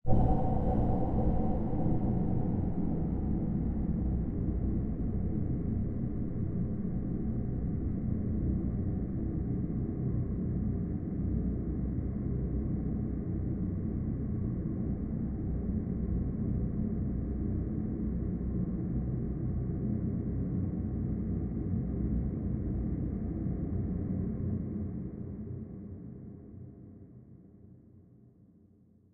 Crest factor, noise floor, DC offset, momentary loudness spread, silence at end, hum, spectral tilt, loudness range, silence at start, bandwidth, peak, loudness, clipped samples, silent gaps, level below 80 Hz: 20 dB; -62 dBFS; under 0.1%; 4 LU; 1.1 s; none; -13.5 dB/octave; 5 LU; 0.05 s; 2.4 kHz; -12 dBFS; -34 LUFS; under 0.1%; none; -38 dBFS